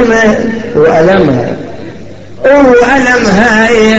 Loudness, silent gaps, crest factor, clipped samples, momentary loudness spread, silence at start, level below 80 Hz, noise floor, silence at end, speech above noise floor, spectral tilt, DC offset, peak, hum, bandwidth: -7 LUFS; none; 8 dB; 0.5%; 15 LU; 0 s; -30 dBFS; -28 dBFS; 0 s; 22 dB; -5.5 dB/octave; under 0.1%; 0 dBFS; none; 8.2 kHz